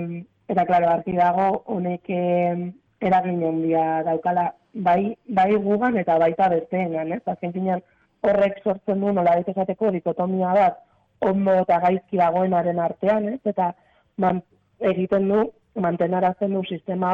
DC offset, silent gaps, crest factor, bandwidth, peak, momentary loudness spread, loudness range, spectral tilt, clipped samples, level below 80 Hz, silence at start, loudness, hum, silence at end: under 0.1%; none; 10 dB; 5.4 kHz; -12 dBFS; 8 LU; 2 LU; -9.5 dB/octave; under 0.1%; -60 dBFS; 0 s; -22 LUFS; none; 0 s